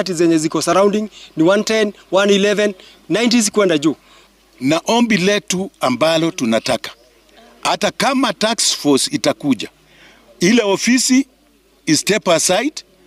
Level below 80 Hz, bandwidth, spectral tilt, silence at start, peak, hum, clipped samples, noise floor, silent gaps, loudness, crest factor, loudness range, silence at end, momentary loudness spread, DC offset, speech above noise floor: -58 dBFS; 16 kHz; -3.5 dB/octave; 0 s; -4 dBFS; none; under 0.1%; -54 dBFS; none; -16 LUFS; 14 dB; 2 LU; 0.25 s; 8 LU; under 0.1%; 38 dB